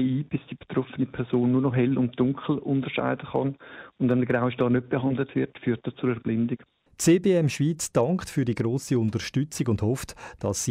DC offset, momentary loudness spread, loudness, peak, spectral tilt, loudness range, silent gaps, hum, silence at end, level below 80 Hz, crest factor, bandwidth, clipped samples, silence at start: under 0.1%; 8 LU; -26 LUFS; -10 dBFS; -6 dB/octave; 2 LU; none; none; 0 s; -56 dBFS; 14 dB; 16 kHz; under 0.1%; 0 s